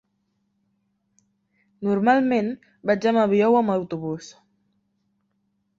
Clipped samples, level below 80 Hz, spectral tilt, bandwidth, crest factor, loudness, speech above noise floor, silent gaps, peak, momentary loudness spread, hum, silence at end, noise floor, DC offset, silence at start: under 0.1%; -66 dBFS; -7 dB/octave; 7.6 kHz; 18 dB; -22 LUFS; 51 dB; none; -8 dBFS; 12 LU; none; 1.5 s; -72 dBFS; under 0.1%; 1.8 s